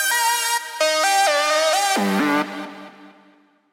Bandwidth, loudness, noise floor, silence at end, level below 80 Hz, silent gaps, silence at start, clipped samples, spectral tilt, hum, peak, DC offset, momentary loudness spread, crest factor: 17 kHz; -18 LUFS; -55 dBFS; 0.65 s; -80 dBFS; none; 0 s; under 0.1%; -2 dB/octave; none; -6 dBFS; under 0.1%; 13 LU; 14 dB